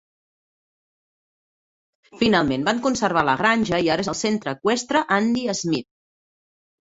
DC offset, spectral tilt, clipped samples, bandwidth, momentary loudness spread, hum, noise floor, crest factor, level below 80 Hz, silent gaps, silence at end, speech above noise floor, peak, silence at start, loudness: under 0.1%; -4 dB/octave; under 0.1%; 8 kHz; 5 LU; none; under -90 dBFS; 20 dB; -54 dBFS; none; 1.05 s; over 69 dB; -2 dBFS; 2.15 s; -21 LUFS